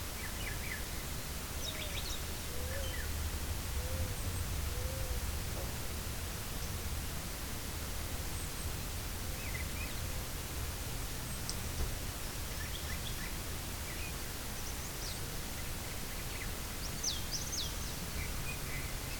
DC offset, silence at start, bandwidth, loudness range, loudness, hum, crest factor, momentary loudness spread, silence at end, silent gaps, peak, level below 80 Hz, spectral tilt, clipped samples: under 0.1%; 0 s; 19 kHz; 1 LU; -39 LUFS; none; 20 dB; 3 LU; 0 s; none; -20 dBFS; -44 dBFS; -3 dB/octave; under 0.1%